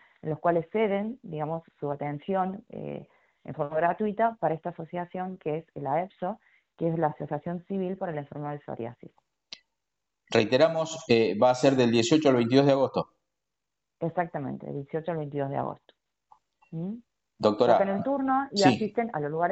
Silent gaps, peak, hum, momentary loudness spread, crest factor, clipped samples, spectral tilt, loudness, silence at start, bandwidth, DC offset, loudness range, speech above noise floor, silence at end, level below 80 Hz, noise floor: none; -4 dBFS; none; 16 LU; 24 dB; under 0.1%; -6 dB/octave; -27 LUFS; 0.25 s; 8.2 kHz; under 0.1%; 11 LU; 60 dB; 0 s; -68 dBFS; -87 dBFS